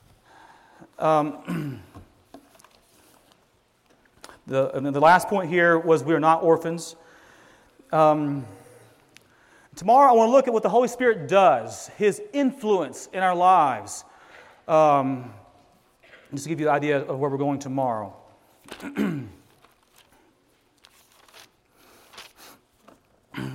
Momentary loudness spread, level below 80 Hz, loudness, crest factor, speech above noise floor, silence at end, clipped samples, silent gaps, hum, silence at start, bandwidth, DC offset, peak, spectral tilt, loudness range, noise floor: 19 LU; -68 dBFS; -22 LUFS; 18 dB; 42 dB; 0 s; under 0.1%; none; none; 1 s; 16 kHz; under 0.1%; -6 dBFS; -5.5 dB/octave; 14 LU; -64 dBFS